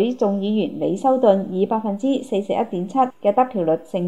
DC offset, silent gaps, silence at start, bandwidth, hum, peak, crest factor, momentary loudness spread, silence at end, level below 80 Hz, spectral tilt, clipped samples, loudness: 0.4%; none; 0 s; 11 kHz; none; -2 dBFS; 18 dB; 6 LU; 0 s; -70 dBFS; -7.5 dB/octave; under 0.1%; -20 LUFS